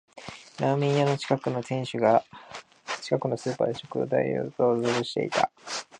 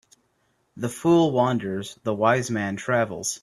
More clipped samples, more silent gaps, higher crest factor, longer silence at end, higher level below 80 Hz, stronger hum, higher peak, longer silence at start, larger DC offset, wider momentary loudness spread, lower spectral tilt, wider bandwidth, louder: neither; neither; about the same, 20 dB vs 20 dB; about the same, 0.15 s vs 0.05 s; second, -70 dBFS vs -62 dBFS; neither; second, -8 dBFS vs -4 dBFS; second, 0.15 s vs 0.75 s; neither; first, 18 LU vs 11 LU; about the same, -5.5 dB/octave vs -5 dB/octave; second, 10.5 kHz vs 13.5 kHz; second, -27 LUFS vs -23 LUFS